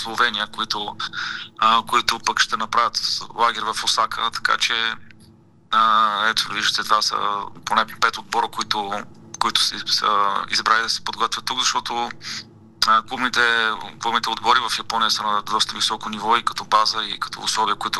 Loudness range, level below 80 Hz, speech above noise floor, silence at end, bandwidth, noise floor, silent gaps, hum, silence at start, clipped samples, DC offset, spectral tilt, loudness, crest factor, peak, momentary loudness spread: 2 LU; -56 dBFS; 29 dB; 0 s; 15 kHz; -50 dBFS; none; none; 0 s; under 0.1%; under 0.1%; -0.5 dB/octave; -20 LUFS; 20 dB; 0 dBFS; 8 LU